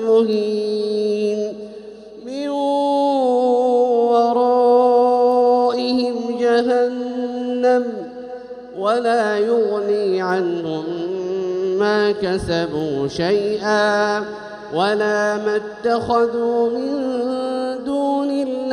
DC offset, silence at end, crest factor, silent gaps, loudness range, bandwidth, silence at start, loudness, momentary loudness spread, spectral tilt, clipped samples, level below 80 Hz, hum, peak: under 0.1%; 0 s; 14 dB; none; 5 LU; 11 kHz; 0 s; -18 LUFS; 10 LU; -5.5 dB/octave; under 0.1%; -54 dBFS; none; -4 dBFS